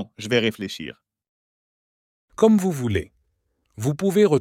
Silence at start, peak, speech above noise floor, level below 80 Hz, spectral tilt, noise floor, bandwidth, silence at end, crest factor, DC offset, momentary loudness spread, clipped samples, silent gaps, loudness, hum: 0 s; -6 dBFS; 50 dB; -58 dBFS; -6 dB/octave; -71 dBFS; 16 kHz; 0 s; 18 dB; under 0.1%; 18 LU; under 0.1%; 1.29-2.28 s; -22 LUFS; none